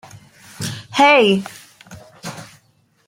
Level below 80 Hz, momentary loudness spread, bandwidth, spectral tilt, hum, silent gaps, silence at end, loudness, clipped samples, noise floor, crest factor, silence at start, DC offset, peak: -60 dBFS; 23 LU; 16.5 kHz; -4 dB/octave; none; none; 0.65 s; -15 LUFS; under 0.1%; -58 dBFS; 18 dB; 0.15 s; under 0.1%; -2 dBFS